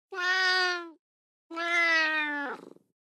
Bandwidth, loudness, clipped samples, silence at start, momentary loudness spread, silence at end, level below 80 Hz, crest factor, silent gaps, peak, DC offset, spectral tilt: 13.5 kHz; -26 LUFS; under 0.1%; 0.1 s; 14 LU; 0.4 s; under -90 dBFS; 16 dB; 0.99-1.50 s; -14 dBFS; under 0.1%; 0 dB/octave